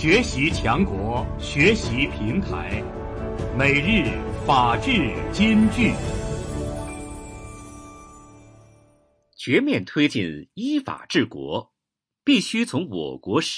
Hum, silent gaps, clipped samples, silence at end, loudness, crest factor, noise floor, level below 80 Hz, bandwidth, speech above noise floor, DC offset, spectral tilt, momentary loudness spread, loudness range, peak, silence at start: none; none; under 0.1%; 0 s; -22 LUFS; 18 dB; -86 dBFS; -36 dBFS; 10.5 kHz; 65 dB; under 0.1%; -5.5 dB/octave; 15 LU; 8 LU; -4 dBFS; 0 s